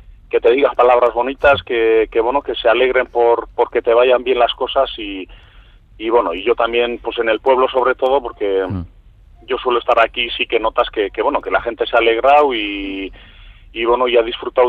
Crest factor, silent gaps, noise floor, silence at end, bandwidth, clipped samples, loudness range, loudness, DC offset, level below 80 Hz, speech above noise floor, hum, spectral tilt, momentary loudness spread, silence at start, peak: 14 dB; none; -44 dBFS; 0 s; 4.8 kHz; under 0.1%; 3 LU; -15 LUFS; under 0.1%; -42 dBFS; 29 dB; none; -6.5 dB/octave; 11 LU; 0.1 s; -2 dBFS